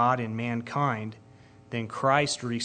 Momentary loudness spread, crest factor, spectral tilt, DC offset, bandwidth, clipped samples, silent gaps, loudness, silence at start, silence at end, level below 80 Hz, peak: 11 LU; 20 dB; -5 dB/octave; under 0.1%; 9.4 kHz; under 0.1%; none; -28 LUFS; 0 s; 0 s; -66 dBFS; -8 dBFS